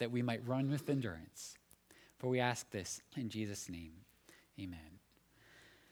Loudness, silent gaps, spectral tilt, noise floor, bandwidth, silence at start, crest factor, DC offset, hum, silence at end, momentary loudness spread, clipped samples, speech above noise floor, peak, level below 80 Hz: -41 LUFS; none; -5 dB/octave; -69 dBFS; over 20 kHz; 0 s; 24 dB; under 0.1%; none; 0.2 s; 23 LU; under 0.1%; 29 dB; -18 dBFS; -70 dBFS